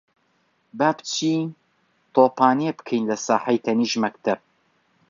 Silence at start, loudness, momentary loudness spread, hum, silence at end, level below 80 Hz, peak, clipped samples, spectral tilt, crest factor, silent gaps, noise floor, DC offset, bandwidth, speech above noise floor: 0.75 s; -22 LUFS; 8 LU; none; 0.7 s; -72 dBFS; -2 dBFS; under 0.1%; -4.5 dB/octave; 20 dB; none; -66 dBFS; under 0.1%; 7.6 kHz; 45 dB